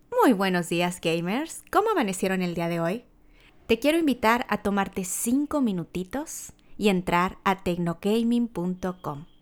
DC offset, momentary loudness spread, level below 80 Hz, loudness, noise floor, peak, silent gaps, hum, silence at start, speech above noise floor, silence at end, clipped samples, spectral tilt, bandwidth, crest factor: under 0.1%; 10 LU; -52 dBFS; -26 LUFS; -55 dBFS; -8 dBFS; none; none; 0.1 s; 30 dB; 0.15 s; under 0.1%; -5 dB/octave; over 20 kHz; 18 dB